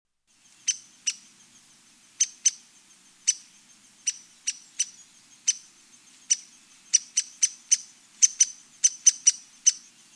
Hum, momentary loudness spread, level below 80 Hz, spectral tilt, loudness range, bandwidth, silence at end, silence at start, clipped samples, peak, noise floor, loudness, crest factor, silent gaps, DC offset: none; 13 LU; -86 dBFS; 5.5 dB/octave; 8 LU; 11 kHz; 0.35 s; 0.65 s; under 0.1%; -6 dBFS; -61 dBFS; -24 LUFS; 24 dB; none; under 0.1%